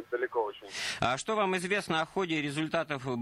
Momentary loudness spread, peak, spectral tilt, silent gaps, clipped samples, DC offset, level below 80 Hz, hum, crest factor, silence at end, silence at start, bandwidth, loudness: 5 LU; -14 dBFS; -4 dB/octave; none; under 0.1%; under 0.1%; -64 dBFS; none; 18 dB; 0 s; 0 s; 13.5 kHz; -31 LUFS